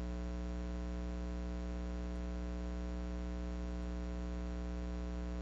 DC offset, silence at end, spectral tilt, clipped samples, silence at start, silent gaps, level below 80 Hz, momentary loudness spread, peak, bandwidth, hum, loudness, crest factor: under 0.1%; 0 s; -7.5 dB/octave; under 0.1%; 0 s; none; -42 dBFS; 0 LU; -32 dBFS; 7.6 kHz; 60 Hz at -40 dBFS; -43 LUFS; 8 dB